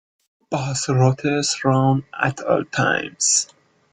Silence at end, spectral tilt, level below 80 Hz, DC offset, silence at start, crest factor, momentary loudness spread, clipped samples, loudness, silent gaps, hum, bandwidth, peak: 0.5 s; -4 dB/octave; -56 dBFS; under 0.1%; 0.5 s; 18 dB; 7 LU; under 0.1%; -20 LUFS; none; none; 9.6 kHz; -2 dBFS